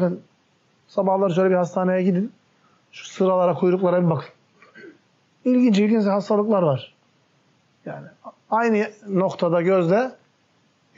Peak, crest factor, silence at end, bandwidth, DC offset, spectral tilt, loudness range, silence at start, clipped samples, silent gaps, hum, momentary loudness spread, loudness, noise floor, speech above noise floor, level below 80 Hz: -10 dBFS; 12 dB; 0.85 s; 7.6 kHz; under 0.1%; -7 dB/octave; 3 LU; 0 s; under 0.1%; none; none; 16 LU; -21 LUFS; -63 dBFS; 43 dB; -76 dBFS